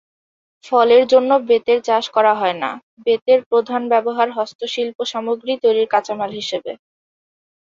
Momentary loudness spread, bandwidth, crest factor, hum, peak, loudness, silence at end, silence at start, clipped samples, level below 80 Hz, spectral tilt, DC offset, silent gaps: 12 LU; 7.6 kHz; 16 dB; none; -2 dBFS; -17 LUFS; 1 s; 0.65 s; under 0.1%; -68 dBFS; -4 dB/octave; under 0.1%; 2.83-2.97 s, 3.22-3.26 s, 3.46-3.51 s, 4.55-4.59 s, 4.95-4.99 s